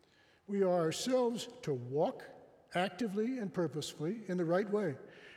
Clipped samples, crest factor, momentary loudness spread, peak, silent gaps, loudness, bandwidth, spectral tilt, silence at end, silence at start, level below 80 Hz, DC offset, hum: under 0.1%; 16 dB; 8 LU; -18 dBFS; none; -36 LUFS; 16 kHz; -5.5 dB/octave; 0 s; 0.5 s; -80 dBFS; under 0.1%; none